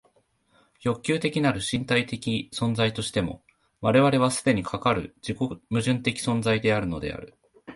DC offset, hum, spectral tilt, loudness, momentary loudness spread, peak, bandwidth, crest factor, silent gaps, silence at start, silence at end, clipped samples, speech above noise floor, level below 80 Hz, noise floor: under 0.1%; none; -5 dB/octave; -25 LUFS; 10 LU; -8 dBFS; 11.5 kHz; 18 dB; none; 0.8 s; 0 s; under 0.1%; 40 dB; -52 dBFS; -65 dBFS